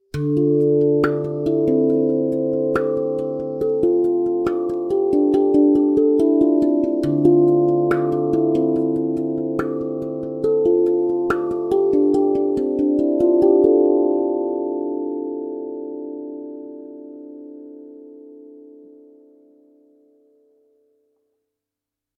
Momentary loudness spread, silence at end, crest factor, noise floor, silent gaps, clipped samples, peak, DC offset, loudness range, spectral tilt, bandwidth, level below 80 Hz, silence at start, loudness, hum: 16 LU; 3.55 s; 16 dB; -86 dBFS; none; under 0.1%; -4 dBFS; under 0.1%; 14 LU; -9.5 dB/octave; 5.6 kHz; -54 dBFS; 0.15 s; -19 LUFS; none